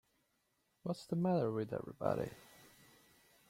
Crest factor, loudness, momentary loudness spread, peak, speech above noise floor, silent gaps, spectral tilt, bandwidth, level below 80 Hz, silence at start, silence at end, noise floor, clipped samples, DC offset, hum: 22 dB; -39 LUFS; 14 LU; -20 dBFS; 43 dB; none; -8 dB/octave; 16 kHz; -72 dBFS; 0.85 s; 0.85 s; -80 dBFS; under 0.1%; under 0.1%; none